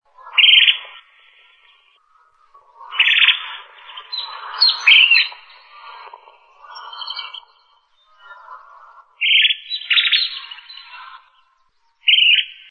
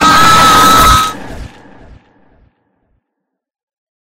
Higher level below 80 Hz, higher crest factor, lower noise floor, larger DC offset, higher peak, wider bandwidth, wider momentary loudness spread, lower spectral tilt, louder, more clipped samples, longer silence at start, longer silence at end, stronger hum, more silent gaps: second, -76 dBFS vs -28 dBFS; first, 18 dB vs 12 dB; second, -62 dBFS vs -74 dBFS; neither; about the same, -2 dBFS vs 0 dBFS; second, 9.4 kHz vs over 20 kHz; about the same, 25 LU vs 23 LU; second, 5.5 dB/octave vs -2.5 dB/octave; second, -12 LUFS vs -6 LUFS; second, under 0.1% vs 1%; first, 0.25 s vs 0 s; second, 0.2 s vs 2.65 s; neither; neither